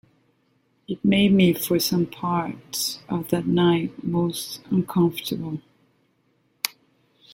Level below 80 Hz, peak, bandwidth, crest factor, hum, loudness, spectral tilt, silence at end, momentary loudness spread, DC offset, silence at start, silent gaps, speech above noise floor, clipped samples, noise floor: -58 dBFS; -2 dBFS; 17 kHz; 22 dB; none; -23 LUFS; -5.5 dB/octave; 0.65 s; 11 LU; under 0.1%; 0.9 s; none; 44 dB; under 0.1%; -66 dBFS